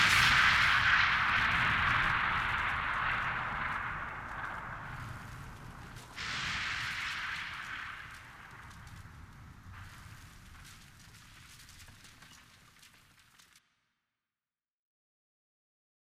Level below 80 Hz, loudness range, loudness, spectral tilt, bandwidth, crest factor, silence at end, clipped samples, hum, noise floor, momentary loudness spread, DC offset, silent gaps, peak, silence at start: -52 dBFS; 25 LU; -30 LUFS; -2 dB/octave; 18 kHz; 22 dB; 3.8 s; under 0.1%; none; under -90 dBFS; 27 LU; under 0.1%; none; -14 dBFS; 0 s